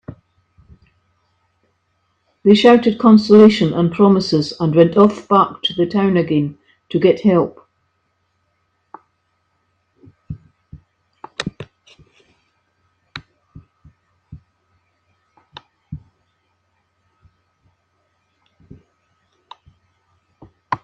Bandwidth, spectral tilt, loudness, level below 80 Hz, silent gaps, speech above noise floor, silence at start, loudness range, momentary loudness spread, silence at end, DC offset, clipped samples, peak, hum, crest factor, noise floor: 8.6 kHz; -7 dB/octave; -14 LUFS; -54 dBFS; none; 54 dB; 0.1 s; 23 LU; 27 LU; 0.1 s; under 0.1%; under 0.1%; 0 dBFS; none; 18 dB; -67 dBFS